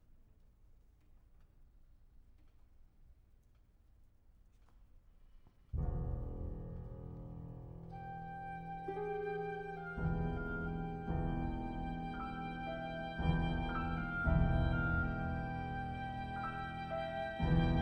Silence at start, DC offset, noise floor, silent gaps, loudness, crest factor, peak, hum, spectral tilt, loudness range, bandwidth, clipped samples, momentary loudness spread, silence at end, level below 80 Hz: 0.1 s; under 0.1%; -66 dBFS; none; -40 LUFS; 20 dB; -20 dBFS; none; -9 dB/octave; 10 LU; 5.8 kHz; under 0.1%; 13 LU; 0 s; -46 dBFS